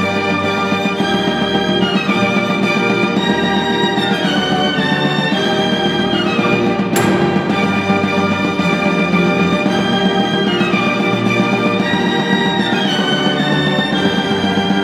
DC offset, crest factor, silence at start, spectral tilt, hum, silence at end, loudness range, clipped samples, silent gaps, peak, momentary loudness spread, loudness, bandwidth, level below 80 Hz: under 0.1%; 14 dB; 0 s; -5.5 dB/octave; none; 0 s; 0 LU; under 0.1%; none; 0 dBFS; 1 LU; -14 LUFS; 14 kHz; -46 dBFS